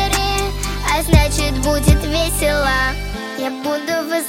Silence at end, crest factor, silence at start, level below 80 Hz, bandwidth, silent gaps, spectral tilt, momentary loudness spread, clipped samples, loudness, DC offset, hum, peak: 0 s; 16 dB; 0 s; -22 dBFS; 16.5 kHz; none; -4.5 dB/octave; 9 LU; under 0.1%; -17 LUFS; under 0.1%; none; 0 dBFS